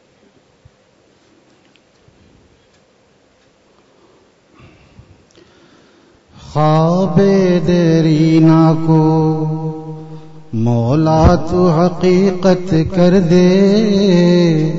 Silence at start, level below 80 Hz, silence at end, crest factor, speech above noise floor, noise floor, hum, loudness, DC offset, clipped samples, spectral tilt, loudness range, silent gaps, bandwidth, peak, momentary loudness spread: 6.45 s; -34 dBFS; 0 s; 12 dB; 42 dB; -53 dBFS; none; -12 LUFS; under 0.1%; under 0.1%; -8 dB/octave; 6 LU; none; 7.6 kHz; -2 dBFS; 10 LU